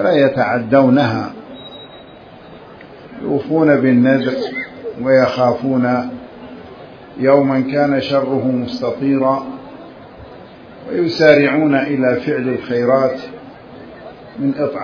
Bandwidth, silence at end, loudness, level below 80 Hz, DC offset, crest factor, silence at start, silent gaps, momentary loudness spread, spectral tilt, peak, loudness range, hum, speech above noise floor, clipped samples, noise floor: 5.4 kHz; 0 s; -15 LUFS; -54 dBFS; under 0.1%; 16 dB; 0 s; none; 24 LU; -8 dB/octave; 0 dBFS; 3 LU; none; 24 dB; under 0.1%; -38 dBFS